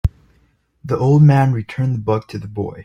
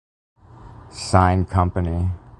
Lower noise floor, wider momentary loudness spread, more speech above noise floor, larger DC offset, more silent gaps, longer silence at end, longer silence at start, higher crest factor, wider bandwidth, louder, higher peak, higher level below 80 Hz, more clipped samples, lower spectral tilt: first, -59 dBFS vs -43 dBFS; about the same, 15 LU vs 13 LU; first, 43 dB vs 24 dB; neither; neither; about the same, 0 s vs 0.1 s; second, 0.05 s vs 0.6 s; second, 14 dB vs 22 dB; second, 7 kHz vs 11.5 kHz; first, -16 LUFS vs -20 LUFS; about the same, -2 dBFS vs 0 dBFS; about the same, -34 dBFS vs -30 dBFS; neither; first, -9.5 dB/octave vs -6.5 dB/octave